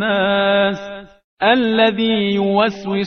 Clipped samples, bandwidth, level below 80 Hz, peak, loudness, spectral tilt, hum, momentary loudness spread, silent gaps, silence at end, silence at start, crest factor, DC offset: under 0.1%; 6.6 kHz; -56 dBFS; 0 dBFS; -16 LUFS; -6.5 dB/octave; none; 10 LU; 1.24-1.37 s; 0 s; 0 s; 16 dB; 0.2%